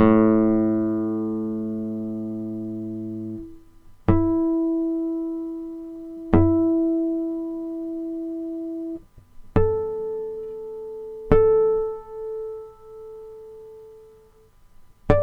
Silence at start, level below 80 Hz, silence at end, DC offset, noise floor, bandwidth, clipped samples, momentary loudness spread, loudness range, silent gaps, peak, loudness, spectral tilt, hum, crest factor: 0 s; -38 dBFS; 0 s; under 0.1%; -53 dBFS; 3.9 kHz; under 0.1%; 20 LU; 6 LU; none; -2 dBFS; -24 LUFS; -10.5 dB/octave; 50 Hz at -55 dBFS; 22 dB